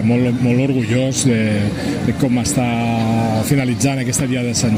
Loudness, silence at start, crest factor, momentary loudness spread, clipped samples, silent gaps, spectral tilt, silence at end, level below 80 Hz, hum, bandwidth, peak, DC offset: -17 LUFS; 0 s; 12 dB; 3 LU; under 0.1%; none; -5.5 dB/octave; 0 s; -42 dBFS; none; 16 kHz; -4 dBFS; under 0.1%